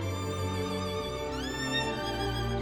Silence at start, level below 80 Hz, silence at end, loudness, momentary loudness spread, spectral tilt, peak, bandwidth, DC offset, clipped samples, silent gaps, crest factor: 0 s; -44 dBFS; 0 s; -32 LUFS; 4 LU; -5 dB/octave; -18 dBFS; 17 kHz; under 0.1%; under 0.1%; none; 14 dB